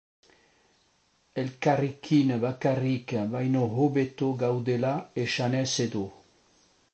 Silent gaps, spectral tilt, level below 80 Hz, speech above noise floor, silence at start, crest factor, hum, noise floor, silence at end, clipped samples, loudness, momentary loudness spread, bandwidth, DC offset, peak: none; -6 dB/octave; -66 dBFS; 41 dB; 1.35 s; 18 dB; none; -68 dBFS; 0.8 s; under 0.1%; -28 LUFS; 6 LU; 8.8 kHz; under 0.1%; -10 dBFS